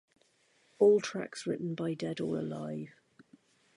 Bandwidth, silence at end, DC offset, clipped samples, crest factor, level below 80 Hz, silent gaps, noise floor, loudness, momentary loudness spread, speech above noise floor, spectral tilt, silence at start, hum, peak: 11 kHz; 0.85 s; under 0.1%; under 0.1%; 20 dB; -76 dBFS; none; -70 dBFS; -32 LUFS; 15 LU; 38 dB; -6 dB/octave; 0.8 s; none; -14 dBFS